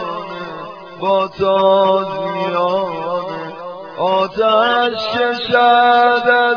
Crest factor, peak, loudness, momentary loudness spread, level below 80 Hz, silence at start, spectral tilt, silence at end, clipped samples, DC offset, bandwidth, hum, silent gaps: 14 dB; 0 dBFS; -15 LUFS; 16 LU; -56 dBFS; 0 s; -5.5 dB/octave; 0 s; under 0.1%; under 0.1%; 5.4 kHz; none; none